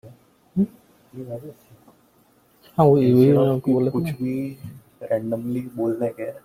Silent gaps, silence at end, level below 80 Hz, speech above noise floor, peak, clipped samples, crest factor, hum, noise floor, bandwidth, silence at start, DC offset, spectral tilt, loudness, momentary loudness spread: none; 0.05 s; -58 dBFS; 38 dB; -2 dBFS; under 0.1%; 20 dB; none; -58 dBFS; 16 kHz; 0.05 s; under 0.1%; -9.5 dB/octave; -21 LUFS; 22 LU